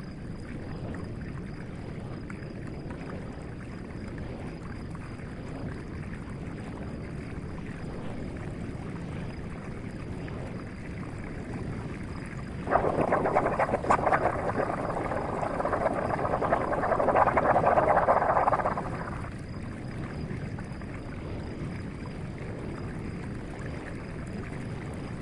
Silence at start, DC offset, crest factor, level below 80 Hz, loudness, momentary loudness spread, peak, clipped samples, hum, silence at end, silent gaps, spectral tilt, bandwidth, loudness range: 0 s; under 0.1%; 22 dB; -46 dBFS; -32 LUFS; 15 LU; -10 dBFS; under 0.1%; none; 0 s; none; -7.5 dB/octave; 11.5 kHz; 13 LU